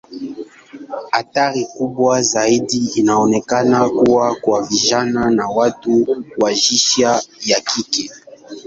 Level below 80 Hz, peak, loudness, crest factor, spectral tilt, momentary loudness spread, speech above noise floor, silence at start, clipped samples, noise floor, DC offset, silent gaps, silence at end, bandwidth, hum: -54 dBFS; -2 dBFS; -15 LUFS; 14 dB; -3 dB/octave; 16 LU; 21 dB; 0.1 s; under 0.1%; -36 dBFS; under 0.1%; none; 0.05 s; 8 kHz; none